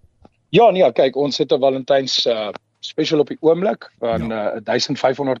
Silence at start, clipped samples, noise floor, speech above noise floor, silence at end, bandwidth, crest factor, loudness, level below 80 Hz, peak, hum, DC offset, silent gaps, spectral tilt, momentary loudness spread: 0.5 s; under 0.1%; -53 dBFS; 35 dB; 0 s; 7.8 kHz; 14 dB; -18 LUFS; -54 dBFS; -4 dBFS; none; under 0.1%; none; -5 dB/octave; 10 LU